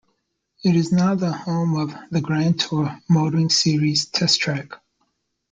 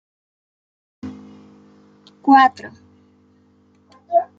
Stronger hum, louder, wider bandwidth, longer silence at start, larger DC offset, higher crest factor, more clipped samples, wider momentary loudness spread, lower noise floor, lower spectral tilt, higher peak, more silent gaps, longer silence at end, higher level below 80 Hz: second, none vs 50 Hz at -65 dBFS; second, -20 LUFS vs -16 LUFS; first, 9.2 kHz vs 7.4 kHz; second, 0.65 s vs 1.05 s; neither; about the same, 18 dB vs 20 dB; neither; second, 8 LU vs 26 LU; first, -72 dBFS vs -56 dBFS; about the same, -5 dB/octave vs -5.5 dB/octave; about the same, -4 dBFS vs -2 dBFS; neither; first, 0.75 s vs 0.15 s; first, -58 dBFS vs -72 dBFS